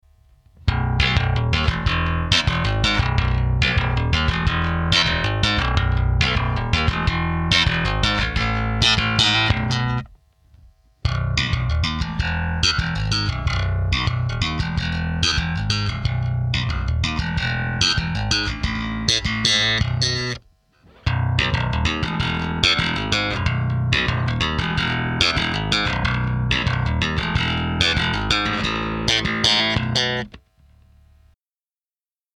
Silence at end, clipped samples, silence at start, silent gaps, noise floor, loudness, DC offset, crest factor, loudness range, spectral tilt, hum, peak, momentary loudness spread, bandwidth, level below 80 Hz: 2 s; under 0.1%; 0.65 s; none; under -90 dBFS; -20 LUFS; under 0.1%; 20 dB; 3 LU; -4 dB/octave; none; 0 dBFS; 6 LU; 11.5 kHz; -30 dBFS